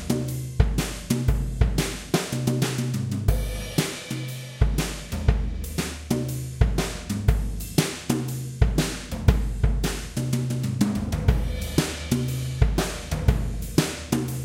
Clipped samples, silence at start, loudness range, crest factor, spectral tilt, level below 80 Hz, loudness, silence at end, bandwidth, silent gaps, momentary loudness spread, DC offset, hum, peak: under 0.1%; 0 s; 2 LU; 22 dB; -5.5 dB/octave; -28 dBFS; -26 LUFS; 0 s; 17 kHz; none; 5 LU; under 0.1%; none; -2 dBFS